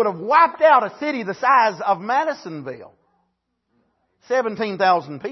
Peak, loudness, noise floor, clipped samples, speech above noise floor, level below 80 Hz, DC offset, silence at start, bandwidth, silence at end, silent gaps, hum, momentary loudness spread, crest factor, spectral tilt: -2 dBFS; -18 LUFS; -73 dBFS; under 0.1%; 53 dB; -72 dBFS; under 0.1%; 0 s; 6.2 kHz; 0 s; none; none; 16 LU; 18 dB; -5 dB/octave